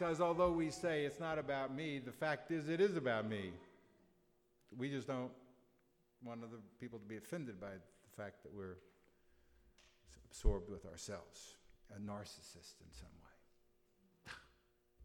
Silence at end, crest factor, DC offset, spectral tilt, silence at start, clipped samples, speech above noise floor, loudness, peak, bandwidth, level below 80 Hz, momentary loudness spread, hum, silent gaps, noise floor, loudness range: 0 s; 24 dB; under 0.1%; -5.5 dB/octave; 0 s; under 0.1%; 34 dB; -43 LUFS; -20 dBFS; 18.5 kHz; -54 dBFS; 22 LU; none; none; -76 dBFS; 14 LU